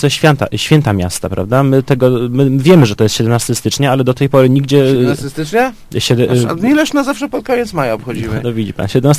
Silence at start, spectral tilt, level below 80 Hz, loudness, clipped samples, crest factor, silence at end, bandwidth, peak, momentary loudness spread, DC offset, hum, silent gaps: 0 s; -6 dB/octave; -38 dBFS; -12 LUFS; 0.4%; 12 dB; 0 s; 15.5 kHz; 0 dBFS; 8 LU; under 0.1%; none; none